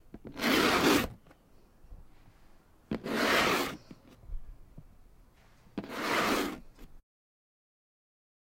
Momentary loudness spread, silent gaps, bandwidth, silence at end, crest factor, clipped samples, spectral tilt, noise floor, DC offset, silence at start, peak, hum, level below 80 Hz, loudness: 23 LU; none; 16 kHz; 1.55 s; 22 dB; under 0.1%; -3.5 dB/octave; -60 dBFS; under 0.1%; 0.15 s; -12 dBFS; none; -52 dBFS; -29 LUFS